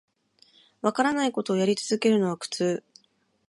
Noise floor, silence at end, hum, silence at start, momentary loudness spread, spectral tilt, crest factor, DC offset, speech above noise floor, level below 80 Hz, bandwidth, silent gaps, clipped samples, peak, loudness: -68 dBFS; 0.7 s; none; 0.85 s; 6 LU; -5 dB/octave; 20 dB; under 0.1%; 43 dB; -72 dBFS; 11.5 kHz; none; under 0.1%; -8 dBFS; -26 LUFS